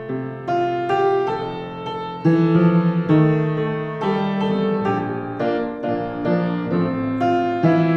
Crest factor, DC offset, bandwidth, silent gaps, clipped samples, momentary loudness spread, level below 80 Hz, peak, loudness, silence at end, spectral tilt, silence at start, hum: 14 dB; under 0.1%; 6.4 kHz; none; under 0.1%; 10 LU; -54 dBFS; -4 dBFS; -20 LUFS; 0 s; -9 dB/octave; 0 s; none